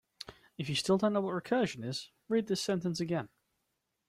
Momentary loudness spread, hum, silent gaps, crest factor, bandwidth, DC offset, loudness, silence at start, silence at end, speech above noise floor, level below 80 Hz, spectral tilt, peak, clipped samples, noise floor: 17 LU; none; none; 18 dB; 15.5 kHz; under 0.1%; -33 LUFS; 0.2 s; 0.8 s; 50 dB; -70 dBFS; -5 dB/octave; -16 dBFS; under 0.1%; -83 dBFS